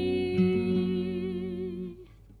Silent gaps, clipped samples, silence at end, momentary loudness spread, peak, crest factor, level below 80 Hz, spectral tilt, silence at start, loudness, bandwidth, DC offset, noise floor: none; under 0.1%; 0.05 s; 14 LU; -14 dBFS; 16 dB; -54 dBFS; -9 dB/octave; 0 s; -29 LUFS; 10.5 kHz; under 0.1%; -49 dBFS